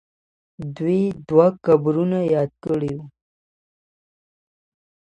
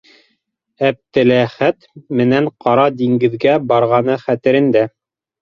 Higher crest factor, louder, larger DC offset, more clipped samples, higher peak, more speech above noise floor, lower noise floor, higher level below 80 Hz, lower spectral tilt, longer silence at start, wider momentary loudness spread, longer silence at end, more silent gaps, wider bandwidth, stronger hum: first, 20 dB vs 14 dB; second, -20 LUFS vs -15 LUFS; neither; neither; about the same, -2 dBFS vs 0 dBFS; first, over 71 dB vs 53 dB; first, under -90 dBFS vs -67 dBFS; about the same, -60 dBFS vs -56 dBFS; about the same, -9.5 dB/octave vs -8.5 dB/octave; second, 0.6 s vs 0.8 s; first, 14 LU vs 5 LU; first, 1.95 s vs 0.55 s; neither; first, 8.4 kHz vs 6.8 kHz; neither